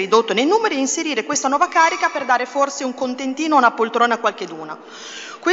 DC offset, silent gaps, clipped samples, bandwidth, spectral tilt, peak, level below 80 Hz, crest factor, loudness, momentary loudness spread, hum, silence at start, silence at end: under 0.1%; none; under 0.1%; 8 kHz; -2 dB/octave; 0 dBFS; -76 dBFS; 18 dB; -18 LUFS; 16 LU; none; 0 s; 0 s